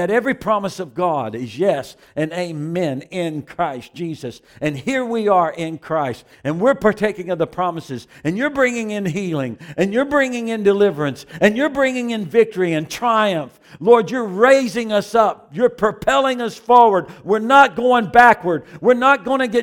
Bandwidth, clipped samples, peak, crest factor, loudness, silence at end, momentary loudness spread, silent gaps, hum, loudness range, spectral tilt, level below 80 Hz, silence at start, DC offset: 17.5 kHz; under 0.1%; 0 dBFS; 18 dB; -18 LUFS; 0 s; 13 LU; none; none; 8 LU; -5.5 dB/octave; -54 dBFS; 0 s; under 0.1%